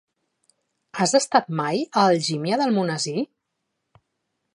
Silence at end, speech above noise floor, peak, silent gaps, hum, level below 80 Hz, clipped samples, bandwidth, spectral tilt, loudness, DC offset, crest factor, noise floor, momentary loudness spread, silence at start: 1.3 s; 57 dB; -2 dBFS; none; none; -76 dBFS; under 0.1%; 11.5 kHz; -4 dB/octave; -22 LUFS; under 0.1%; 22 dB; -78 dBFS; 9 LU; 0.95 s